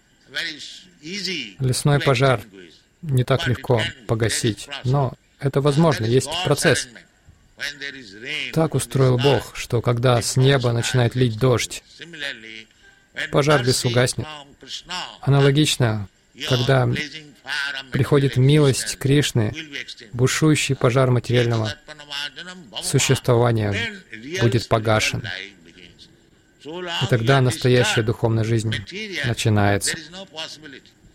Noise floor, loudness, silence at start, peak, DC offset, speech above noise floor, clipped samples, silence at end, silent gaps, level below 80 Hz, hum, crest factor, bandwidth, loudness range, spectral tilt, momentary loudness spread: -55 dBFS; -20 LUFS; 0.3 s; -2 dBFS; under 0.1%; 34 dB; under 0.1%; 0.35 s; none; -48 dBFS; none; 18 dB; 16 kHz; 3 LU; -5 dB/octave; 15 LU